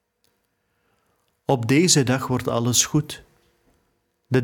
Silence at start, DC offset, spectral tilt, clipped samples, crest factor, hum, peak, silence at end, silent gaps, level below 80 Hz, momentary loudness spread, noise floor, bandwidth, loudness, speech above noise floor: 1.5 s; under 0.1%; -4 dB/octave; under 0.1%; 20 dB; none; -4 dBFS; 0 s; none; -54 dBFS; 15 LU; -71 dBFS; 18 kHz; -20 LUFS; 51 dB